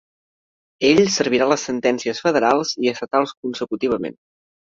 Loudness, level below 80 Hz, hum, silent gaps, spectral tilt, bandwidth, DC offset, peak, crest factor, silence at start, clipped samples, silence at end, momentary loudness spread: -19 LUFS; -60 dBFS; none; 3.37-3.43 s; -4 dB/octave; 7.8 kHz; under 0.1%; -2 dBFS; 18 dB; 0.8 s; under 0.1%; 0.65 s; 10 LU